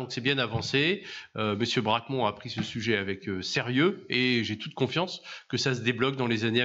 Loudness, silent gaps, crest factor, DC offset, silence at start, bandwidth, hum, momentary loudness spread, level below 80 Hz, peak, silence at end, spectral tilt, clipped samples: -28 LUFS; none; 16 dB; under 0.1%; 0 s; 8 kHz; none; 8 LU; -64 dBFS; -12 dBFS; 0 s; -5 dB/octave; under 0.1%